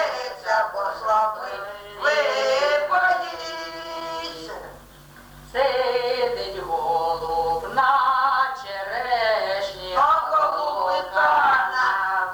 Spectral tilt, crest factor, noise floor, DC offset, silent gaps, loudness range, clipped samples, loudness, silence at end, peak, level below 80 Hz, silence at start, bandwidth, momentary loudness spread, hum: -2.5 dB/octave; 16 dB; -46 dBFS; under 0.1%; none; 5 LU; under 0.1%; -22 LUFS; 0 s; -6 dBFS; -54 dBFS; 0 s; over 20 kHz; 12 LU; none